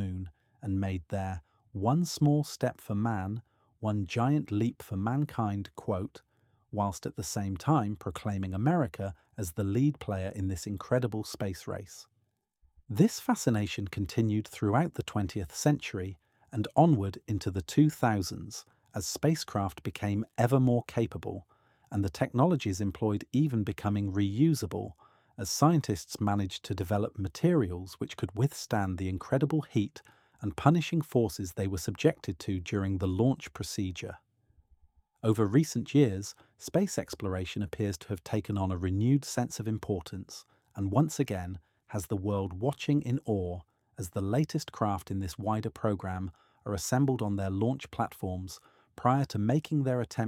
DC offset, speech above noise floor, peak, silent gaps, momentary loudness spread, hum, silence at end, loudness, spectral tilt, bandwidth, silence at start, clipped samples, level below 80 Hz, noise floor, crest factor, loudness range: under 0.1%; 46 dB; -6 dBFS; none; 13 LU; none; 0 s; -31 LUFS; -6.5 dB/octave; 16.5 kHz; 0 s; under 0.1%; -58 dBFS; -77 dBFS; 24 dB; 3 LU